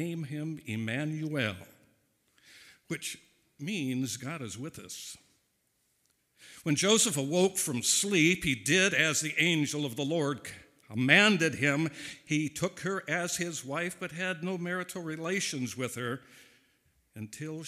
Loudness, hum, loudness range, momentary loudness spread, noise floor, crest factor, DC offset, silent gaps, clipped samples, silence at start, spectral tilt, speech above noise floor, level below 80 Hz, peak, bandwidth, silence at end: -29 LUFS; none; 12 LU; 17 LU; -75 dBFS; 24 dB; under 0.1%; none; under 0.1%; 0 s; -3.5 dB/octave; 44 dB; -66 dBFS; -6 dBFS; 16 kHz; 0 s